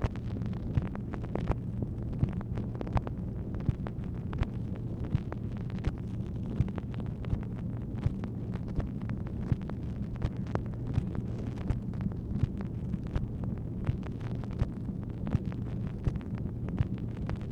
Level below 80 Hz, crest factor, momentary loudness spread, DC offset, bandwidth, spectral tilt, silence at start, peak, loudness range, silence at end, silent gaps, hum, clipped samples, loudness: -40 dBFS; 24 dB; 4 LU; under 0.1%; 6.8 kHz; -9.5 dB/octave; 0 s; -10 dBFS; 1 LU; 0 s; none; none; under 0.1%; -35 LUFS